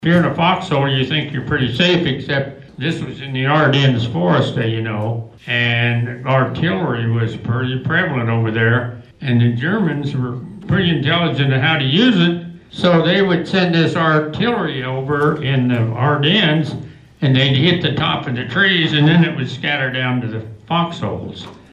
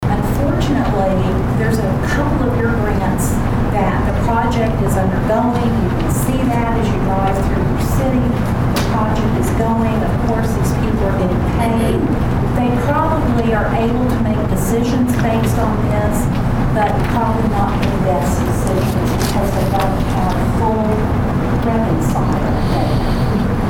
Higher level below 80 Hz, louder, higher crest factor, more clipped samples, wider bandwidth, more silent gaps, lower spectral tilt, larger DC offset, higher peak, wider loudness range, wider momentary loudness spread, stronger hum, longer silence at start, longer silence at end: second, -48 dBFS vs -24 dBFS; about the same, -16 LUFS vs -16 LUFS; about the same, 14 dB vs 12 dB; neither; second, 8.4 kHz vs 18 kHz; neither; about the same, -7 dB/octave vs -7 dB/octave; second, under 0.1% vs 0.3%; about the same, -4 dBFS vs -4 dBFS; about the same, 3 LU vs 1 LU; first, 10 LU vs 2 LU; neither; about the same, 0 s vs 0 s; first, 0.15 s vs 0 s